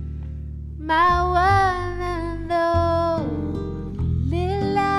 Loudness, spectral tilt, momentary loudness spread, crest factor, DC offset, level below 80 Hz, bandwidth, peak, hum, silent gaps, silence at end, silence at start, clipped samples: -22 LUFS; -7 dB/octave; 15 LU; 14 dB; under 0.1%; -34 dBFS; 11.5 kHz; -8 dBFS; none; none; 0 s; 0 s; under 0.1%